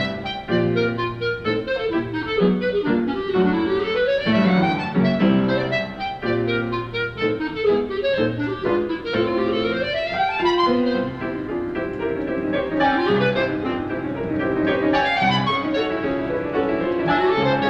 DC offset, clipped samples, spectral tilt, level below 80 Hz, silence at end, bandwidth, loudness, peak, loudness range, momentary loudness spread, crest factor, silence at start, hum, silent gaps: under 0.1%; under 0.1%; -7.5 dB/octave; -46 dBFS; 0 s; 7.6 kHz; -21 LUFS; -6 dBFS; 3 LU; 7 LU; 14 dB; 0 s; none; none